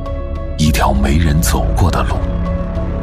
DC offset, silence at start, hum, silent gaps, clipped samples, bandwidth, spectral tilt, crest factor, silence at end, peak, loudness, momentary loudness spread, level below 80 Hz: under 0.1%; 0 s; none; none; under 0.1%; 16 kHz; -5.5 dB/octave; 14 dB; 0 s; 0 dBFS; -16 LUFS; 8 LU; -18 dBFS